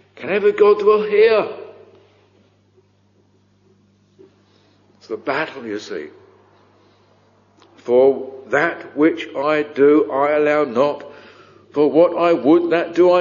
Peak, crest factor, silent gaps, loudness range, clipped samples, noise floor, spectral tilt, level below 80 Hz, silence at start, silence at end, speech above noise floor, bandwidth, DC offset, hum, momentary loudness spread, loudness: -2 dBFS; 18 dB; none; 13 LU; under 0.1%; -58 dBFS; -4 dB/octave; -66 dBFS; 0.15 s; 0 s; 42 dB; 7.2 kHz; under 0.1%; 50 Hz at -60 dBFS; 15 LU; -17 LUFS